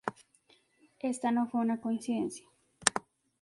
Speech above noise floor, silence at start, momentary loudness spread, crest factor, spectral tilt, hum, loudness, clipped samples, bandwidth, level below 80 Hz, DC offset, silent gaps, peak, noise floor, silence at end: 35 dB; 0.05 s; 11 LU; 32 dB; -3 dB/octave; none; -33 LUFS; under 0.1%; 11.5 kHz; -72 dBFS; under 0.1%; none; -2 dBFS; -67 dBFS; 0.4 s